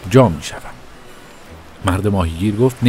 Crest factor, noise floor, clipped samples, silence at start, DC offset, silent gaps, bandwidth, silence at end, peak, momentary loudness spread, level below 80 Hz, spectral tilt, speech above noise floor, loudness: 18 dB; -38 dBFS; under 0.1%; 0 s; under 0.1%; none; 16 kHz; 0 s; 0 dBFS; 26 LU; -36 dBFS; -7 dB/octave; 23 dB; -17 LUFS